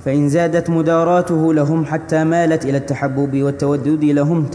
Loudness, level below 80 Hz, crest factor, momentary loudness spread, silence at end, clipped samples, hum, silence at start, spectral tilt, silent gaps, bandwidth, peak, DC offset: -16 LUFS; -52 dBFS; 12 dB; 4 LU; 0 s; under 0.1%; none; 0 s; -8 dB/octave; none; 11 kHz; -4 dBFS; under 0.1%